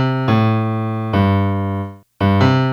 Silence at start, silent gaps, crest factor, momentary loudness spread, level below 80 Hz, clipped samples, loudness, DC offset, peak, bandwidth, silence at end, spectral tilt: 0 s; none; 16 dB; 8 LU; -50 dBFS; under 0.1%; -17 LUFS; under 0.1%; 0 dBFS; 6.8 kHz; 0 s; -8.5 dB/octave